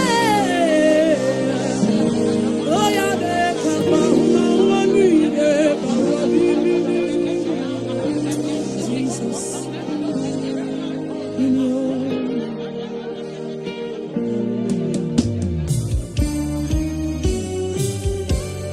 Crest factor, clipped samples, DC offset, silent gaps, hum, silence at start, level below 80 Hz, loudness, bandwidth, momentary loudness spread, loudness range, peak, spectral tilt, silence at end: 16 dB; under 0.1%; under 0.1%; none; none; 0 s; -36 dBFS; -20 LUFS; 13.5 kHz; 11 LU; 7 LU; -2 dBFS; -5.5 dB/octave; 0 s